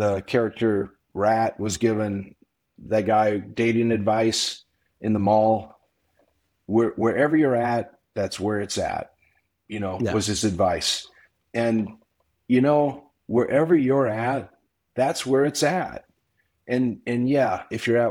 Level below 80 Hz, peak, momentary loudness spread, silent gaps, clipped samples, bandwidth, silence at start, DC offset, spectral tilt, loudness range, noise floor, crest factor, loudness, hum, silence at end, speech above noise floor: -56 dBFS; -8 dBFS; 12 LU; none; under 0.1%; 16.5 kHz; 0 s; under 0.1%; -5 dB/octave; 3 LU; -71 dBFS; 16 dB; -23 LUFS; none; 0 s; 49 dB